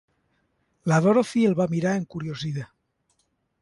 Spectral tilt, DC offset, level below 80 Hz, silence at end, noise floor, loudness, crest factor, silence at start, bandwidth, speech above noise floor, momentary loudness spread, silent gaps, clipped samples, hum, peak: -7 dB/octave; under 0.1%; -62 dBFS; 0.95 s; -72 dBFS; -24 LUFS; 18 dB; 0.85 s; 11.5 kHz; 49 dB; 13 LU; none; under 0.1%; none; -8 dBFS